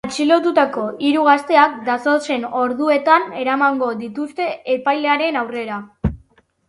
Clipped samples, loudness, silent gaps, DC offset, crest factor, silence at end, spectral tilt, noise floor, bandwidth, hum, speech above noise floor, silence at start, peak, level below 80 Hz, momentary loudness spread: under 0.1%; -17 LUFS; none; under 0.1%; 18 dB; 0.5 s; -5.5 dB/octave; -54 dBFS; 11.5 kHz; none; 37 dB; 0.05 s; 0 dBFS; -42 dBFS; 11 LU